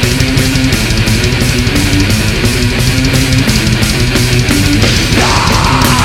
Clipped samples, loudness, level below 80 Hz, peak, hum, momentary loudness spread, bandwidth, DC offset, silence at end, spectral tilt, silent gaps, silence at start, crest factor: 0.2%; -10 LUFS; -18 dBFS; 0 dBFS; none; 2 LU; 17 kHz; under 0.1%; 0 s; -4 dB/octave; none; 0 s; 10 dB